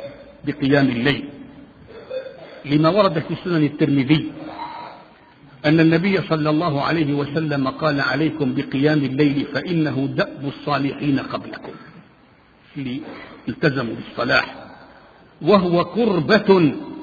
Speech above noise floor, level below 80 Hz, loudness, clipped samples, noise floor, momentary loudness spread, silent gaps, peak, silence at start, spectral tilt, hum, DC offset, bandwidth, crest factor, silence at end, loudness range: 33 dB; -54 dBFS; -19 LUFS; under 0.1%; -52 dBFS; 16 LU; none; 0 dBFS; 0 s; -8.5 dB/octave; none; under 0.1%; 7 kHz; 20 dB; 0 s; 6 LU